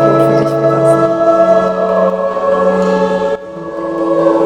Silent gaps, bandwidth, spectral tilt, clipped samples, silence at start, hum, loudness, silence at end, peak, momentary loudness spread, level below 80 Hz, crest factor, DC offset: none; 15.5 kHz; -7.5 dB/octave; under 0.1%; 0 s; none; -12 LUFS; 0 s; 0 dBFS; 8 LU; -46 dBFS; 12 dB; under 0.1%